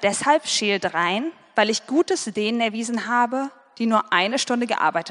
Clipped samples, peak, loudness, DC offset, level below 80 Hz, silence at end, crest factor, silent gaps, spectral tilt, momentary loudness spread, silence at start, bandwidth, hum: under 0.1%; -2 dBFS; -22 LUFS; under 0.1%; -70 dBFS; 0 s; 20 dB; none; -3 dB/octave; 7 LU; 0 s; 10.5 kHz; none